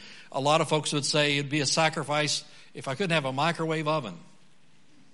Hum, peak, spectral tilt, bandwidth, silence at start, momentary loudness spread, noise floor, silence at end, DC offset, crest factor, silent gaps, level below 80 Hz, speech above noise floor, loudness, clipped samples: none; -8 dBFS; -3.5 dB/octave; 11.5 kHz; 0 s; 12 LU; -62 dBFS; 0.9 s; 0.3%; 20 dB; none; -70 dBFS; 35 dB; -26 LUFS; under 0.1%